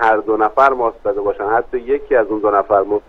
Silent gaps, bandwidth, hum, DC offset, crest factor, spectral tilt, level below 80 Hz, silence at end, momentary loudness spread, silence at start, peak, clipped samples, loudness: none; 6.8 kHz; none; under 0.1%; 16 dB; -7 dB/octave; -44 dBFS; 0.1 s; 7 LU; 0 s; 0 dBFS; under 0.1%; -16 LUFS